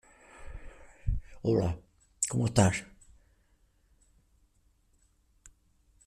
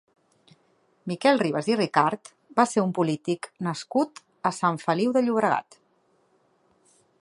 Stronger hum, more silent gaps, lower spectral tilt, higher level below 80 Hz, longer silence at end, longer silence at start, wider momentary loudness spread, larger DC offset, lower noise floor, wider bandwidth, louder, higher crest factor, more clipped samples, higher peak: neither; neither; about the same, -5.5 dB/octave vs -5.5 dB/octave; first, -46 dBFS vs -76 dBFS; first, 3.2 s vs 1.6 s; second, 0.35 s vs 1.05 s; first, 24 LU vs 9 LU; neither; about the same, -68 dBFS vs -66 dBFS; first, 14 kHz vs 11.5 kHz; second, -30 LUFS vs -25 LUFS; about the same, 24 dB vs 22 dB; neither; second, -10 dBFS vs -4 dBFS